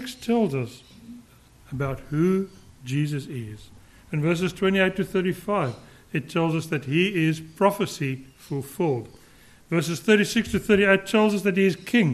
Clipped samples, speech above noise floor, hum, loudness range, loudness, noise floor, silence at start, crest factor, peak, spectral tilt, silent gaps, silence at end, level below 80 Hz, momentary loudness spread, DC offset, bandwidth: under 0.1%; 29 dB; none; 6 LU; -24 LUFS; -52 dBFS; 0 s; 18 dB; -6 dBFS; -6 dB/octave; none; 0 s; -54 dBFS; 15 LU; under 0.1%; 13 kHz